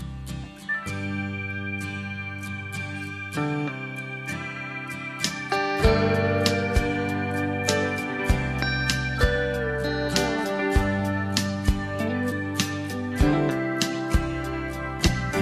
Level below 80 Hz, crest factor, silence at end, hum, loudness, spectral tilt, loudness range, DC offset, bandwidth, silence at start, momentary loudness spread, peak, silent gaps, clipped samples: -34 dBFS; 20 dB; 0 s; none; -26 LUFS; -5 dB/octave; 7 LU; under 0.1%; 14 kHz; 0 s; 10 LU; -6 dBFS; none; under 0.1%